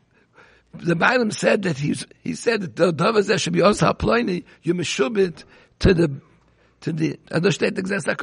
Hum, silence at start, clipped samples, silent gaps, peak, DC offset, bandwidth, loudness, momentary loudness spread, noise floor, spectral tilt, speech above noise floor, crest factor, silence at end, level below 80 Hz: none; 0.75 s; under 0.1%; none; -4 dBFS; under 0.1%; 10.5 kHz; -21 LUFS; 9 LU; -57 dBFS; -5.5 dB/octave; 37 dB; 18 dB; 0 s; -42 dBFS